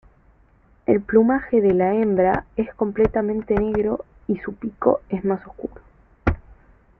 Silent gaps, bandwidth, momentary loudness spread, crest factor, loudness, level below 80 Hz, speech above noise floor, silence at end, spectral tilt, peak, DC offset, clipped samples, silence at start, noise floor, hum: none; 4.1 kHz; 12 LU; 18 dB; -21 LUFS; -40 dBFS; 35 dB; 0.6 s; -11 dB/octave; -4 dBFS; under 0.1%; under 0.1%; 0.9 s; -56 dBFS; none